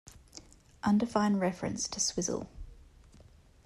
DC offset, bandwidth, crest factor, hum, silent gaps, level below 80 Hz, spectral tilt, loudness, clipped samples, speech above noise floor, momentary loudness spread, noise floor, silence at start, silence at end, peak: under 0.1%; 12.5 kHz; 18 dB; none; none; -56 dBFS; -4 dB/octave; -31 LUFS; under 0.1%; 27 dB; 23 LU; -58 dBFS; 0.05 s; 0.85 s; -14 dBFS